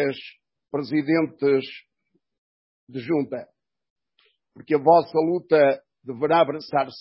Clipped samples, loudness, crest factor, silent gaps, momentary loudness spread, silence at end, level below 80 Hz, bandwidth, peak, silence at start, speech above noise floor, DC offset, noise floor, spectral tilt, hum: under 0.1%; -22 LUFS; 20 dB; 2.38-2.87 s, 3.90-3.96 s; 19 LU; 0 s; -72 dBFS; 5.8 kHz; -4 dBFS; 0 s; 51 dB; under 0.1%; -73 dBFS; -10.5 dB/octave; none